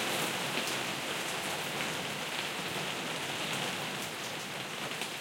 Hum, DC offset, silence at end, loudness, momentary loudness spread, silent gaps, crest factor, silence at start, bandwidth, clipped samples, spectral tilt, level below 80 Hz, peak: none; under 0.1%; 0 s; -34 LUFS; 5 LU; none; 20 dB; 0 s; 17 kHz; under 0.1%; -2 dB/octave; -76 dBFS; -16 dBFS